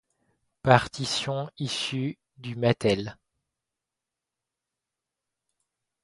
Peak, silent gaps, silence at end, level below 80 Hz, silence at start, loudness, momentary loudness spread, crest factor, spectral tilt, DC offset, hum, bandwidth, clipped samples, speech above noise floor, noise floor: -2 dBFS; none; 2.9 s; -58 dBFS; 0.65 s; -26 LUFS; 14 LU; 28 dB; -5 dB/octave; under 0.1%; none; 11.5 kHz; under 0.1%; 62 dB; -88 dBFS